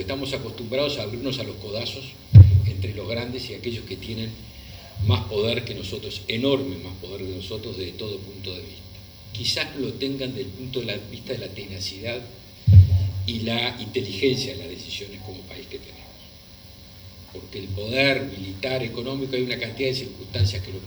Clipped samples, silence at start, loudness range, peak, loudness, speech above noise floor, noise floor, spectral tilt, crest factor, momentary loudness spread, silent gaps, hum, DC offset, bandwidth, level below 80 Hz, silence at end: under 0.1%; 0 s; 10 LU; 0 dBFS; -24 LUFS; 18 dB; -45 dBFS; -6.5 dB/octave; 24 dB; 20 LU; none; none; under 0.1%; over 20 kHz; -40 dBFS; 0 s